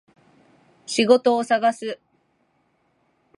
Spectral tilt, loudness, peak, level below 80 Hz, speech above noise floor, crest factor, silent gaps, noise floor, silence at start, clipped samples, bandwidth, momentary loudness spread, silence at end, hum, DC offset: -3.5 dB/octave; -20 LUFS; -4 dBFS; -78 dBFS; 47 dB; 20 dB; none; -67 dBFS; 0.9 s; under 0.1%; 11.5 kHz; 19 LU; 1.45 s; none; under 0.1%